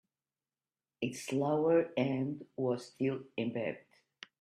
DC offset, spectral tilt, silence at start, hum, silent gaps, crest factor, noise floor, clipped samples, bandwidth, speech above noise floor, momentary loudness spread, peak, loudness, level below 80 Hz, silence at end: under 0.1%; -6.5 dB/octave; 1 s; none; none; 18 dB; under -90 dBFS; under 0.1%; 13.5 kHz; over 56 dB; 11 LU; -18 dBFS; -34 LUFS; -76 dBFS; 0.6 s